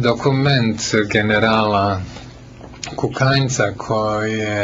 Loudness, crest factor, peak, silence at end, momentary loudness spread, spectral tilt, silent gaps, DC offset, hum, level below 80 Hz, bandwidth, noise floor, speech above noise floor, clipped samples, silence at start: -17 LUFS; 16 dB; -2 dBFS; 0 s; 11 LU; -5 dB/octave; none; under 0.1%; none; -44 dBFS; 7.8 kHz; -37 dBFS; 20 dB; under 0.1%; 0 s